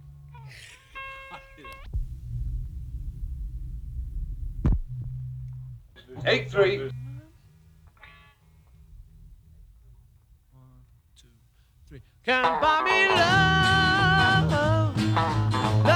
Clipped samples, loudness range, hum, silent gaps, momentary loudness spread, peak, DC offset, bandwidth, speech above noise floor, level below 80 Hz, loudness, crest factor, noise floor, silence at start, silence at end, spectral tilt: under 0.1%; 17 LU; none; none; 24 LU; -8 dBFS; under 0.1%; 12.5 kHz; 36 dB; -38 dBFS; -23 LUFS; 20 dB; -59 dBFS; 0.05 s; 0 s; -5.5 dB/octave